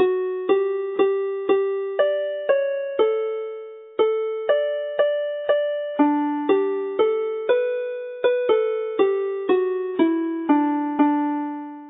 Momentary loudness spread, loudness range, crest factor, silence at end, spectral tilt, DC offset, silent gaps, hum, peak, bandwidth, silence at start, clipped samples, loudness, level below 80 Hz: 5 LU; 2 LU; 16 dB; 0 s; -9 dB/octave; under 0.1%; none; none; -6 dBFS; 3.9 kHz; 0 s; under 0.1%; -22 LUFS; -76 dBFS